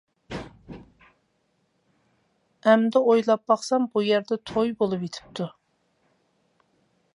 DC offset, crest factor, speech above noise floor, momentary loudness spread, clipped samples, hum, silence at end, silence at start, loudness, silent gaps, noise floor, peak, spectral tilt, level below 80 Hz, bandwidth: under 0.1%; 22 dB; 48 dB; 19 LU; under 0.1%; none; 1.65 s; 0.3 s; -23 LUFS; none; -71 dBFS; -4 dBFS; -5.5 dB/octave; -60 dBFS; 11 kHz